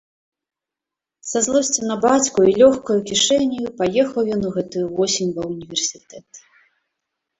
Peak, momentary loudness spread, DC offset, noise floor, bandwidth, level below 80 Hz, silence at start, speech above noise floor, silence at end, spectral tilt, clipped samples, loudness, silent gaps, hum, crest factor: -2 dBFS; 10 LU; under 0.1%; -87 dBFS; 8.4 kHz; -56 dBFS; 1.25 s; 68 dB; 1 s; -3.5 dB/octave; under 0.1%; -18 LUFS; none; none; 18 dB